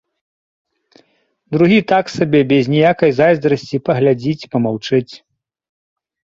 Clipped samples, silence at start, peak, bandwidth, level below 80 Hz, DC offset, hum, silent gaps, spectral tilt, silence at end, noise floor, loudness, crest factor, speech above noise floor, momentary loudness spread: under 0.1%; 1.5 s; 0 dBFS; 7.8 kHz; -54 dBFS; under 0.1%; none; none; -7 dB/octave; 1.25 s; -61 dBFS; -15 LUFS; 16 dB; 47 dB; 7 LU